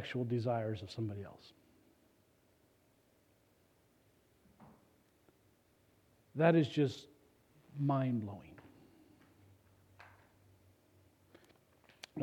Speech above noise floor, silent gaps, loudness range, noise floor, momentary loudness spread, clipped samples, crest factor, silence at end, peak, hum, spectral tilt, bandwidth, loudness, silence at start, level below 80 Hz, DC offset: 37 dB; none; 15 LU; -71 dBFS; 24 LU; under 0.1%; 26 dB; 0 s; -14 dBFS; none; -8 dB/octave; 16 kHz; -36 LUFS; 0 s; -78 dBFS; under 0.1%